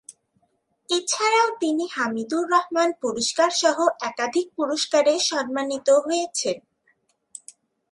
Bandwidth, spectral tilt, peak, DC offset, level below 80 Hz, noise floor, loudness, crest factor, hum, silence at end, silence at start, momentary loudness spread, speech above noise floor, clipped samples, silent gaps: 11.5 kHz; -1.5 dB/octave; -4 dBFS; under 0.1%; -74 dBFS; -69 dBFS; -22 LUFS; 20 dB; none; 1.35 s; 0.1 s; 7 LU; 47 dB; under 0.1%; none